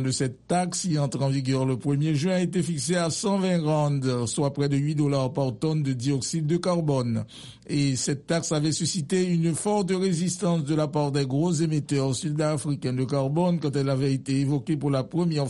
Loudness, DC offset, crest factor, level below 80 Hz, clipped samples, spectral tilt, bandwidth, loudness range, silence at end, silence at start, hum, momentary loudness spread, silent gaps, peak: -25 LUFS; under 0.1%; 14 dB; -60 dBFS; under 0.1%; -6 dB/octave; 11.5 kHz; 1 LU; 0 s; 0 s; none; 3 LU; none; -12 dBFS